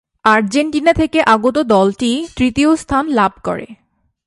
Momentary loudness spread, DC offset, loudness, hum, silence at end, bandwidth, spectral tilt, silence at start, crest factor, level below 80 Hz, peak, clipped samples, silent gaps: 6 LU; under 0.1%; -14 LUFS; none; 0.5 s; 11.5 kHz; -5 dB/octave; 0.25 s; 14 dB; -38 dBFS; 0 dBFS; under 0.1%; none